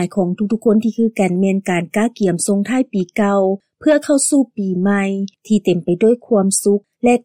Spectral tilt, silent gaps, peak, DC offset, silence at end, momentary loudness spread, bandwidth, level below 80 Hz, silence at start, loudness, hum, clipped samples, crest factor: -5.5 dB/octave; none; -4 dBFS; under 0.1%; 0.05 s; 5 LU; 16 kHz; -58 dBFS; 0 s; -16 LUFS; none; under 0.1%; 12 dB